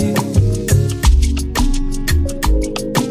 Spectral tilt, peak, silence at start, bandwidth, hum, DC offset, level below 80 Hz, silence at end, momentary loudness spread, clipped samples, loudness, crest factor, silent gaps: -5.5 dB/octave; -2 dBFS; 0 s; 16 kHz; none; under 0.1%; -18 dBFS; 0 s; 4 LU; under 0.1%; -17 LUFS; 14 dB; none